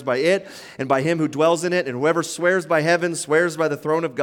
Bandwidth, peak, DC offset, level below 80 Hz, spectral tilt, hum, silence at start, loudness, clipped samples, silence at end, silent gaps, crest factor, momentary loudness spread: 17 kHz; -4 dBFS; under 0.1%; -68 dBFS; -5 dB/octave; none; 0 s; -20 LUFS; under 0.1%; 0 s; none; 16 dB; 4 LU